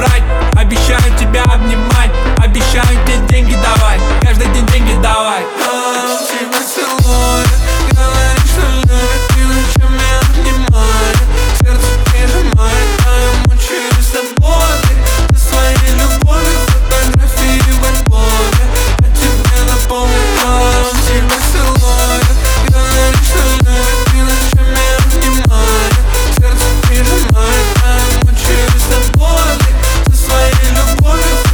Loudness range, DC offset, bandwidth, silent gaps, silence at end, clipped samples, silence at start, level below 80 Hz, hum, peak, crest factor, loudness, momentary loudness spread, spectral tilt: 1 LU; under 0.1%; over 20 kHz; none; 0 s; under 0.1%; 0 s; -10 dBFS; none; 0 dBFS; 8 dB; -11 LUFS; 2 LU; -4.5 dB/octave